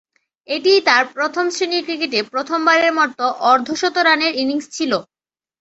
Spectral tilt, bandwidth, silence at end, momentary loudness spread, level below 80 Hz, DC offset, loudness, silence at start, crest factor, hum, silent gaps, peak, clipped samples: -2 dB/octave; 8.2 kHz; 0.6 s; 7 LU; -66 dBFS; under 0.1%; -17 LUFS; 0.5 s; 16 dB; none; none; -2 dBFS; under 0.1%